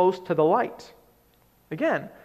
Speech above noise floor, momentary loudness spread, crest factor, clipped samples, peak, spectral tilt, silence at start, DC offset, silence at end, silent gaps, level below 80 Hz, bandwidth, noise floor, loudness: 37 dB; 16 LU; 16 dB; under 0.1%; -8 dBFS; -7 dB/octave; 0 s; under 0.1%; 0.15 s; none; -68 dBFS; 12.5 kHz; -61 dBFS; -25 LUFS